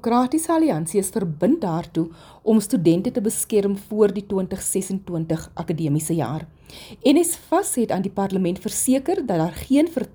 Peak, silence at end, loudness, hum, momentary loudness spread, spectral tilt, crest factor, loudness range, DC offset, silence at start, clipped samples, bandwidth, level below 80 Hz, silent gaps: -6 dBFS; 0.05 s; -22 LUFS; none; 8 LU; -5.5 dB/octave; 16 dB; 2 LU; under 0.1%; 0.05 s; under 0.1%; over 20 kHz; -52 dBFS; none